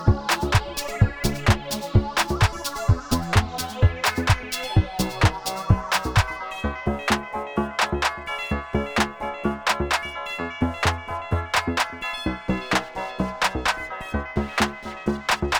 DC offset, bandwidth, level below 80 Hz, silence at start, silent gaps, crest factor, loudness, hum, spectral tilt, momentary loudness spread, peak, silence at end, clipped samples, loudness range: under 0.1%; over 20 kHz; -34 dBFS; 0 s; none; 20 dB; -24 LUFS; none; -4.5 dB/octave; 7 LU; -2 dBFS; 0 s; under 0.1%; 3 LU